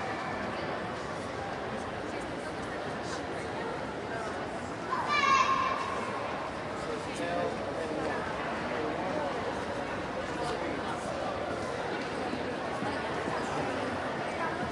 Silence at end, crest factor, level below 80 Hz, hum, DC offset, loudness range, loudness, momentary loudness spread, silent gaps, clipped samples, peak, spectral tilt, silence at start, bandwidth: 0 s; 20 dB; -58 dBFS; none; under 0.1%; 6 LU; -33 LUFS; 7 LU; none; under 0.1%; -14 dBFS; -4.5 dB/octave; 0 s; 11.5 kHz